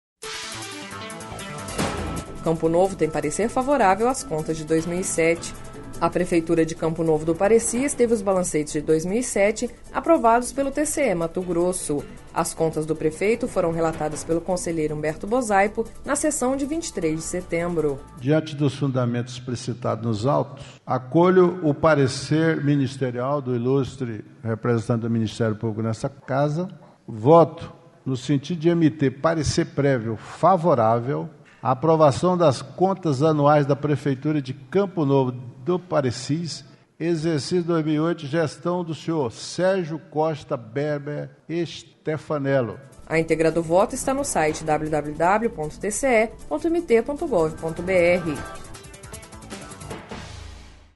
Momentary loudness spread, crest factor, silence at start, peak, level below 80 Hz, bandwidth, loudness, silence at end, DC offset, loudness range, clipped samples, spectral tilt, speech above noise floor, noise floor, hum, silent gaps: 13 LU; 20 dB; 0.2 s; -2 dBFS; -46 dBFS; 11.5 kHz; -23 LUFS; 0.25 s; under 0.1%; 5 LU; under 0.1%; -5.5 dB/octave; 20 dB; -42 dBFS; none; none